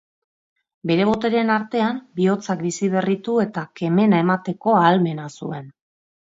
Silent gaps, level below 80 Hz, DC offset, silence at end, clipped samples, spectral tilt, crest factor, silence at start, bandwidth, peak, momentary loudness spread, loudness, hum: none; -62 dBFS; under 0.1%; 0.5 s; under 0.1%; -6.5 dB/octave; 18 dB; 0.85 s; 7.8 kHz; -2 dBFS; 13 LU; -20 LUFS; none